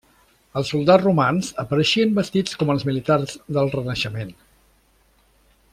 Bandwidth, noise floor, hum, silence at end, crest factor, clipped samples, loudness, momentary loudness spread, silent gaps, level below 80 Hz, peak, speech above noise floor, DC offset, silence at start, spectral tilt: 15 kHz; -59 dBFS; none; 1.4 s; 18 dB; under 0.1%; -20 LUFS; 11 LU; none; -54 dBFS; -4 dBFS; 39 dB; under 0.1%; 0.55 s; -6 dB/octave